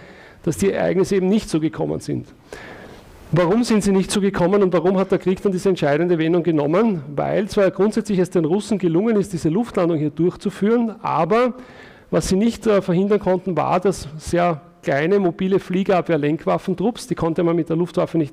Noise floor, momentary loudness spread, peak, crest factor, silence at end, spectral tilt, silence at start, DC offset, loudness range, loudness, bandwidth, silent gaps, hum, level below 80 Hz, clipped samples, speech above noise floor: -41 dBFS; 6 LU; -10 dBFS; 10 dB; 0 s; -6.5 dB/octave; 0 s; under 0.1%; 2 LU; -19 LUFS; 15 kHz; none; none; -46 dBFS; under 0.1%; 22 dB